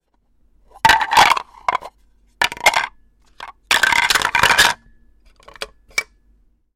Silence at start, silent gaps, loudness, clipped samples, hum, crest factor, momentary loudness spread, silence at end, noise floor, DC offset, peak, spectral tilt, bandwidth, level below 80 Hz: 0.85 s; none; -15 LUFS; under 0.1%; none; 20 dB; 21 LU; 0.7 s; -59 dBFS; under 0.1%; 0 dBFS; 0 dB/octave; 16.5 kHz; -46 dBFS